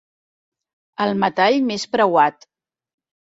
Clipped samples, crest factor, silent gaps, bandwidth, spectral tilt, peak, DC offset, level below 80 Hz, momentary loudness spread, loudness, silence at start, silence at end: under 0.1%; 18 dB; none; 7.8 kHz; -5 dB/octave; -4 dBFS; under 0.1%; -66 dBFS; 7 LU; -18 LUFS; 1 s; 1.05 s